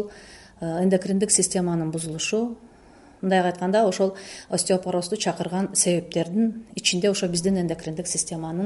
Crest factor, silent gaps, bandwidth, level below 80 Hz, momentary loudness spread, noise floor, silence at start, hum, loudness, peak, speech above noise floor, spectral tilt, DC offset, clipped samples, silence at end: 20 dB; none; 11.5 kHz; -56 dBFS; 8 LU; -50 dBFS; 0 s; none; -23 LUFS; -4 dBFS; 26 dB; -4 dB/octave; under 0.1%; under 0.1%; 0 s